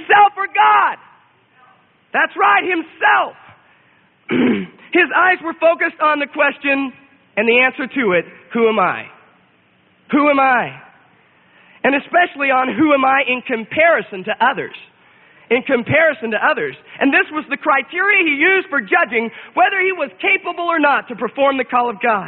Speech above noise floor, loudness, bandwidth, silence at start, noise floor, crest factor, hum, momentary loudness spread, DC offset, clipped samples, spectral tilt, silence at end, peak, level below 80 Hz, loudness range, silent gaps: 39 dB; -15 LUFS; 4.3 kHz; 0 s; -55 dBFS; 16 dB; none; 8 LU; under 0.1%; under 0.1%; -10 dB/octave; 0 s; 0 dBFS; -64 dBFS; 3 LU; none